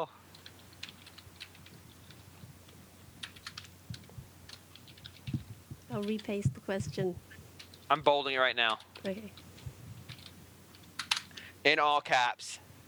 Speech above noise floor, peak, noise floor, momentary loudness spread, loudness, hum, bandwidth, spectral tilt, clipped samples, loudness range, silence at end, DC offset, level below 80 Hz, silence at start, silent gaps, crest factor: 24 dB; -10 dBFS; -55 dBFS; 25 LU; -32 LUFS; none; over 20 kHz; -4 dB/octave; under 0.1%; 17 LU; 0.1 s; under 0.1%; -64 dBFS; 0 s; none; 26 dB